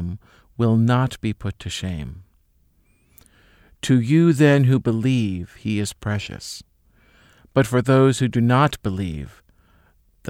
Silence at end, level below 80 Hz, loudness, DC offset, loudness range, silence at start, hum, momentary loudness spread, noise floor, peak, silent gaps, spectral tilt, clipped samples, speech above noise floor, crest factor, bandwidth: 0 s; -46 dBFS; -20 LUFS; under 0.1%; 5 LU; 0 s; none; 18 LU; -60 dBFS; -2 dBFS; none; -6.5 dB/octave; under 0.1%; 41 dB; 18 dB; 15.5 kHz